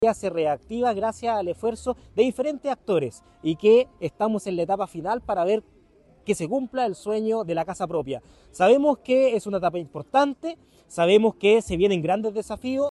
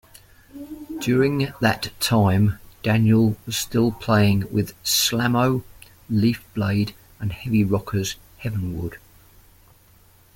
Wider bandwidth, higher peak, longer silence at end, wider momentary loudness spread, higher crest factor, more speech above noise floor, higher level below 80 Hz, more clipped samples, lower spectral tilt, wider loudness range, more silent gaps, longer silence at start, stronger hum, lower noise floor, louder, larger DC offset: second, 12 kHz vs 17 kHz; second, -6 dBFS vs -2 dBFS; second, 0 s vs 1.4 s; about the same, 11 LU vs 12 LU; about the same, 16 dB vs 20 dB; about the same, 33 dB vs 33 dB; second, -54 dBFS vs -48 dBFS; neither; about the same, -5.5 dB/octave vs -5 dB/octave; about the same, 5 LU vs 6 LU; neither; second, 0 s vs 0.55 s; neither; about the same, -56 dBFS vs -54 dBFS; about the same, -24 LUFS vs -22 LUFS; neither